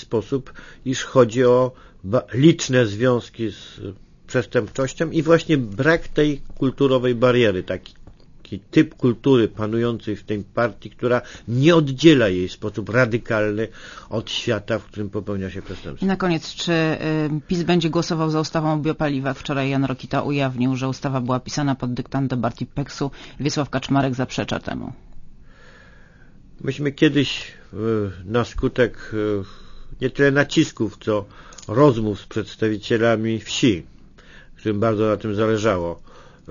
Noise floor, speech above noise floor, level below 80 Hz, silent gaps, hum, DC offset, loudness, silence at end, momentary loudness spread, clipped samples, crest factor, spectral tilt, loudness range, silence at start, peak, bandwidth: -46 dBFS; 26 dB; -44 dBFS; none; none; under 0.1%; -21 LUFS; 0 s; 13 LU; under 0.1%; 20 dB; -6 dB/octave; 6 LU; 0 s; 0 dBFS; 7.4 kHz